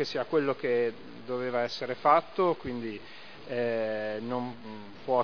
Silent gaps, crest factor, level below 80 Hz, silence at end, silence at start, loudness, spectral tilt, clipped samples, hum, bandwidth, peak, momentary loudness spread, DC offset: none; 20 dB; -68 dBFS; 0 s; 0 s; -30 LUFS; -6 dB/octave; under 0.1%; none; 5.4 kHz; -10 dBFS; 19 LU; 0.4%